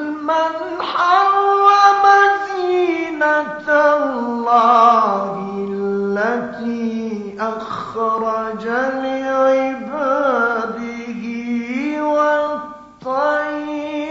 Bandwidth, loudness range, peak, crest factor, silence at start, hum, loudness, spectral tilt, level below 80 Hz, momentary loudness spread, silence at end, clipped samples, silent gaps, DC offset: 7.8 kHz; 7 LU; 0 dBFS; 16 dB; 0 s; none; -17 LUFS; -2.5 dB/octave; -60 dBFS; 13 LU; 0 s; under 0.1%; none; under 0.1%